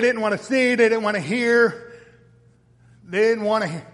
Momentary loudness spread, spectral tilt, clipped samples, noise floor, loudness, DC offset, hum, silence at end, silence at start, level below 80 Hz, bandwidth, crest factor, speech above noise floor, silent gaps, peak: 6 LU; -5 dB/octave; under 0.1%; -55 dBFS; -20 LUFS; under 0.1%; none; 0.1 s; 0 s; -66 dBFS; 11.5 kHz; 18 dB; 35 dB; none; -4 dBFS